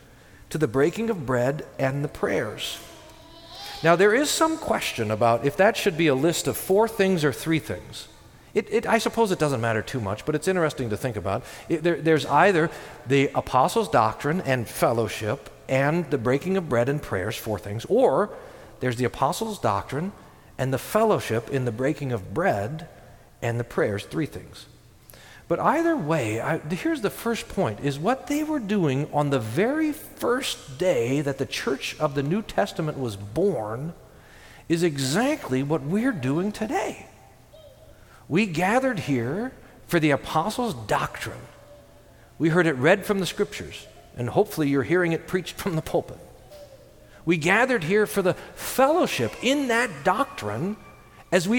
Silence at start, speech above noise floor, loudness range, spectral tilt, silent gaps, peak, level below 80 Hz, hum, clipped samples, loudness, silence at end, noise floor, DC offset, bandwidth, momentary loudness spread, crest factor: 0.5 s; 27 dB; 5 LU; -5.5 dB/octave; none; -4 dBFS; -52 dBFS; none; under 0.1%; -24 LUFS; 0 s; -51 dBFS; under 0.1%; 19 kHz; 11 LU; 20 dB